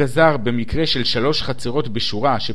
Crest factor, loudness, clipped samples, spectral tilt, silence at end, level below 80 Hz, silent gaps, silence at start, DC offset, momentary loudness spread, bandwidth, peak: 18 dB; -19 LUFS; under 0.1%; -5.5 dB/octave; 0 s; -38 dBFS; none; 0 s; 6%; 7 LU; 13 kHz; -2 dBFS